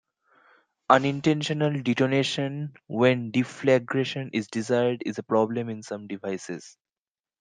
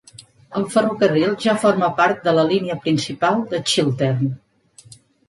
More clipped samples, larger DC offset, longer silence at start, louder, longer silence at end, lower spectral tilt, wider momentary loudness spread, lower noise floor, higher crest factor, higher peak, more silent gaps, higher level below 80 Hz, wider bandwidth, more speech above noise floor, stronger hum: neither; neither; first, 0.9 s vs 0.2 s; second, -25 LUFS vs -19 LUFS; first, 0.7 s vs 0.35 s; about the same, -6 dB/octave vs -5.5 dB/octave; first, 13 LU vs 6 LU; first, under -90 dBFS vs -47 dBFS; first, 24 dB vs 16 dB; about the same, -2 dBFS vs -4 dBFS; neither; second, -70 dBFS vs -60 dBFS; second, 9.8 kHz vs 11.5 kHz; first, over 65 dB vs 29 dB; neither